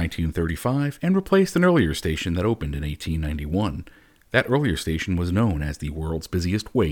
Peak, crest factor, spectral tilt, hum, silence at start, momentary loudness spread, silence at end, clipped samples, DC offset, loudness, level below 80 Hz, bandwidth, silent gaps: -4 dBFS; 20 dB; -6.5 dB/octave; none; 0 s; 10 LU; 0 s; under 0.1%; under 0.1%; -23 LUFS; -36 dBFS; 19 kHz; none